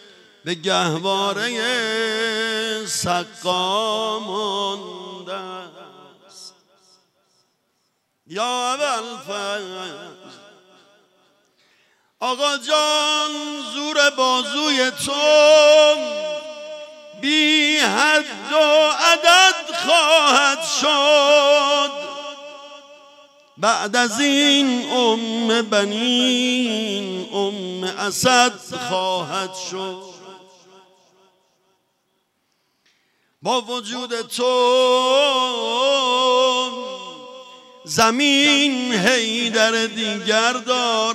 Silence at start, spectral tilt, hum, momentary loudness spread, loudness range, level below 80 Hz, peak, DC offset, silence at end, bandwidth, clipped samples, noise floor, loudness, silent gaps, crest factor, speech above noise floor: 0.45 s; -2 dB/octave; none; 17 LU; 15 LU; -70 dBFS; -2 dBFS; under 0.1%; 0 s; 16 kHz; under 0.1%; -69 dBFS; -17 LUFS; none; 18 dB; 51 dB